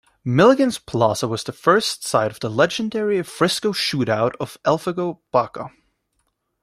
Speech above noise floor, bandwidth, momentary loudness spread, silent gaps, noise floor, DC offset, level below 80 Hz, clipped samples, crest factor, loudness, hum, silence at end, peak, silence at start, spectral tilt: 51 dB; 16 kHz; 9 LU; none; -71 dBFS; under 0.1%; -58 dBFS; under 0.1%; 18 dB; -20 LUFS; none; 0.95 s; -2 dBFS; 0.25 s; -5 dB/octave